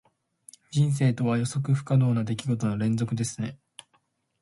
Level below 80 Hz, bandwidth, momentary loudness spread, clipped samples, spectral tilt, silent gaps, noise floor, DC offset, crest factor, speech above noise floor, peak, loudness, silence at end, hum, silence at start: -60 dBFS; 11.5 kHz; 8 LU; under 0.1%; -6.5 dB/octave; none; -70 dBFS; under 0.1%; 14 dB; 45 dB; -12 dBFS; -26 LUFS; 0.85 s; none; 0.7 s